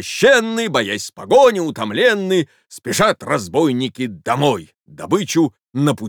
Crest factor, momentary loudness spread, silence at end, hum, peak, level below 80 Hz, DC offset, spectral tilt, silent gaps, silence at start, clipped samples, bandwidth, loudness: 14 dB; 12 LU; 0 s; none; -2 dBFS; -58 dBFS; under 0.1%; -4.5 dB/octave; 5.68-5.72 s; 0 s; under 0.1%; over 20 kHz; -17 LUFS